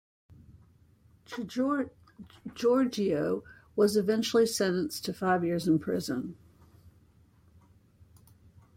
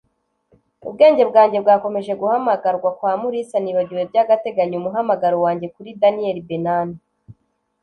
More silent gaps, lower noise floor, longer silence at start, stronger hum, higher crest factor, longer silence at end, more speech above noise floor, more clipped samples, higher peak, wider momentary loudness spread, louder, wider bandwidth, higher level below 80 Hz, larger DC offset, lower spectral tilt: neither; about the same, -62 dBFS vs -64 dBFS; second, 0.3 s vs 0.85 s; neither; about the same, 18 dB vs 16 dB; first, 1.85 s vs 0.5 s; second, 33 dB vs 47 dB; neither; second, -14 dBFS vs -2 dBFS; first, 14 LU vs 10 LU; second, -29 LUFS vs -18 LUFS; first, 16.5 kHz vs 9.2 kHz; about the same, -66 dBFS vs -64 dBFS; neither; second, -5 dB/octave vs -7.5 dB/octave